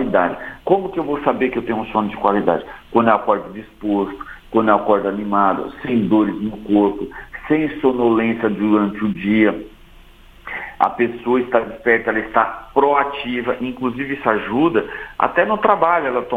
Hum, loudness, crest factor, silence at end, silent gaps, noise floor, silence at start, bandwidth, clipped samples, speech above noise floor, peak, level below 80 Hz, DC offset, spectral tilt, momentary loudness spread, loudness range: none; -18 LUFS; 18 dB; 0 s; none; -44 dBFS; 0 s; 4.6 kHz; under 0.1%; 26 dB; 0 dBFS; -46 dBFS; under 0.1%; -8 dB/octave; 8 LU; 1 LU